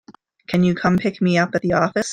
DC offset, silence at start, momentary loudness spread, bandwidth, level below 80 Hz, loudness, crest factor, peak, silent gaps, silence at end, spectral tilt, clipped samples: under 0.1%; 0.1 s; 2 LU; 9.2 kHz; -52 dBFS; -19 LUFS; 16 dB; -2 dBFS; none; 0 s; -6 dB/octave; under 0.1%